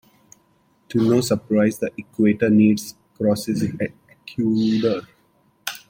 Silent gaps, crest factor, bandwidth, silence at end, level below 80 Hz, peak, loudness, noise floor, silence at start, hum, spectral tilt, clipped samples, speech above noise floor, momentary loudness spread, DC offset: none; 16 dB; 16.5 kHz; 0.1 s; -58 dBFS; -6 dBFS; -21 LUFS; -61 dBFS; 0.9 s; none; -6 dB/octave; under 0.1%; 42 dB; 13 LU; under 0.1%